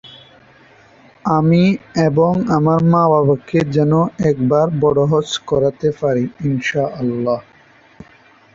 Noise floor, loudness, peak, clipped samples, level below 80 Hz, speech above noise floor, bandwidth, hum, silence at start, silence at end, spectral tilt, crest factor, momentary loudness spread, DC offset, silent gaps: -48 dBFS; -16 LUFS; -2 dBFS; under 0.1%; -48 dBFS; 34 dB; 7.6 kHz; none; 0.05 s; 1.15 s; -7.5 dB/octave; 14 dB; 7 LU; under 0.1%; none